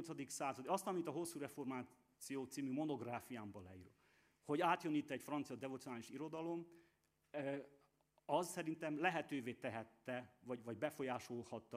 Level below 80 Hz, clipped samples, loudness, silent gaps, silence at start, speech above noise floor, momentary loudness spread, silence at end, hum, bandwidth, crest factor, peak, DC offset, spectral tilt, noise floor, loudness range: -88 dBFS; under 0.1%; -45 LUFS; none; 0 s; 34 dB; 12 LU; 0 s; none; 15.5 kHz; 22 dB; -22 dBFS; under 0.1%; -5 dB/octave; -79 dBFS; 4 LU